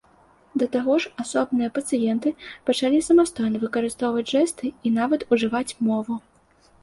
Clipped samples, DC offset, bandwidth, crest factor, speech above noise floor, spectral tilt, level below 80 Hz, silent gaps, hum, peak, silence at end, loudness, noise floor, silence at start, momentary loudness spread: under 0.1%; under 0.1%; 11.5 kHz; 16 dB; 36 dB; -4.5 dB/octave; -60 dBFS; none; none; -6 dBFS; 0.65 s; -23 LUFS; -58 dBFS; 0.55 s; 8 LU